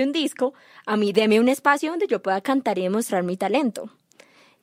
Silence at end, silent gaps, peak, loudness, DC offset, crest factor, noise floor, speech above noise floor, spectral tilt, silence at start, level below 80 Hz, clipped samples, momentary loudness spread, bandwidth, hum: 0.75 s; none; -4 dBFS; -22 LUFS; under 0.1%; 20 dB; -54 dBFS; 32 dB; -4.5 dB/octave; 0 s; -74 dBFS; under 0.1%; 9 LU; 16 kHz; none